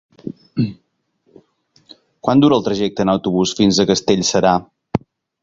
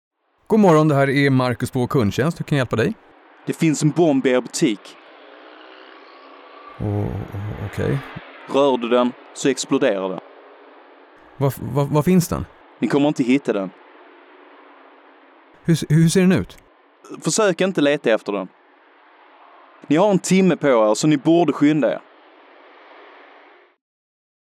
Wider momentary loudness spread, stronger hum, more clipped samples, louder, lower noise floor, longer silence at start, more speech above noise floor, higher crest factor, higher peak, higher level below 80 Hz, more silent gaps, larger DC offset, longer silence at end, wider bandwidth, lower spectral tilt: about the same, 12 LU vs 13 LU; neither; neither; about the same, -17 LUFS vs -19 LUFS; first, -66 dBFS vs -52 dBFS; second, 0.25 s vs 0.5 s; first, 51 dB vs 34 dB; about the same, 18 dB vs 14 dB; first, 0 dBFS vs -6 dBFS; about the same, -48 dBFS vs -52 dBFS; neither; neither; second, 0.45 s vs 2.45 s; second, 7.8 kHz vs 16 kHz; about the same, -5 dB/octave vs -6 dB/octave